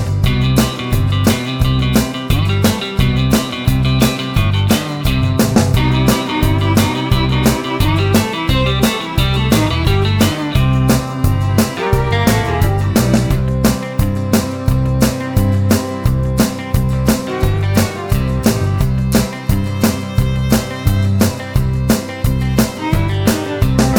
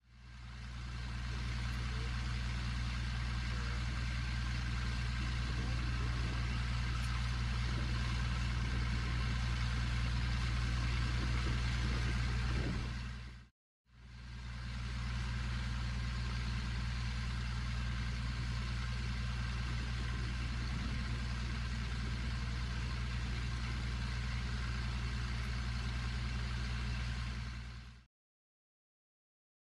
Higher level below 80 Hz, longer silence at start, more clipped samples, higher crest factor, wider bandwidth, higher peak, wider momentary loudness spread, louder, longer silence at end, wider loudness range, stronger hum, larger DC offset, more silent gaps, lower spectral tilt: first, -24 dBFS vs -40 dBFS; about the same, 0 s vs 0.1 s; neither; about the same, 14 dB vs 12 dB; first, over 20 kHz vs 11 kHz; first, 0 dBFS vs -26 dBFS; second, 4 LU vs 7 LU; first, -15 LUFS vs -39 LUFS; second, 0 s vs 1.65 s; second, 2 LU vs 5 LU; second, none vs 60 Hz at -40 dBFS; neither; second, none vs 13.51-13.85 s; about the same, -5.5 dB/octave vs -5 dB/octave